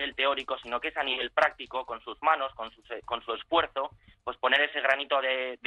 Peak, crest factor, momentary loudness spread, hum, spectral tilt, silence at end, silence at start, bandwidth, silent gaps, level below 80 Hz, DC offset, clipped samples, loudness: -10 dBFS; 20 dB; 14 LU; none; -3 dB/octave; 0.1 s; 0 s; 11 kHz; none; -62 dBFS; under 0.1%; under 0.1%; -28 LUFS